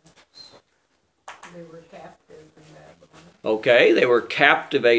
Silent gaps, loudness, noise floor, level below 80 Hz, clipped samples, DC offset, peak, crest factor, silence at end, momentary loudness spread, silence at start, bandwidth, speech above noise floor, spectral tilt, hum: none; -18 LUFS; -68 dBFS; -70 dBFS; under 0.1%; under 0.1%; 0 dBFS; 22 dB; 0 s; 26 LU; 1.3 s; 8 kHz; 47 dB; -5 dB/octave; none